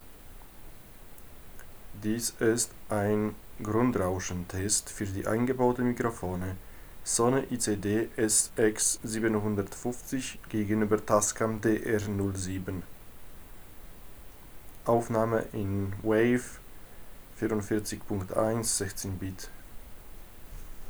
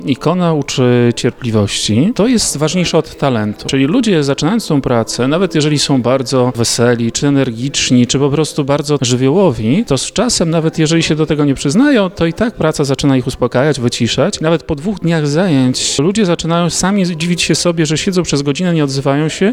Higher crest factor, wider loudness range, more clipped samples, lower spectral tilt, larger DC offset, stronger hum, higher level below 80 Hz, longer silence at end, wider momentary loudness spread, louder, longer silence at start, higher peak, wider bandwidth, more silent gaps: first, 20 dB vs 12 dB; first, 5 LU vs 1 LU; neither; about the same, -4.5 dB/octave vs -5 dB/octave; neither; neither; second, -50 dBFS vs -38 dBFS; about the same, 0 s vs 0 s; first, 25 LU vs 4 LU; second, -29 LUFS vs -13 LUFS; about the same, 0 s vs 0 s; second, -10 dBFS vs 0 dBFS; first, over 20 kHz vs 16 kHz; neither